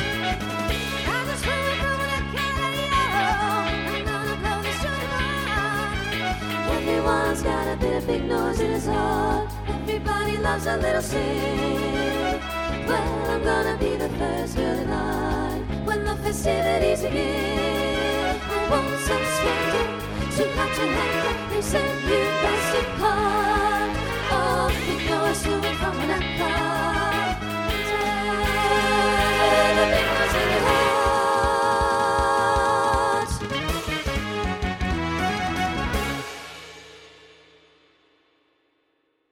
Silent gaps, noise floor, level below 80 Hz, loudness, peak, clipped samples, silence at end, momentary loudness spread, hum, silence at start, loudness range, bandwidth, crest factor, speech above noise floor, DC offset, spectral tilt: none; -70 dBFS; -36 dBFS; -23 LUFS; -4 dBFS; under 0.1%; 2.2 s; 6 LU; none; 0 s; 5 LU; over 20 kHz; 20 dB; 47 dB; under 0.1%; -4.5 dB/octave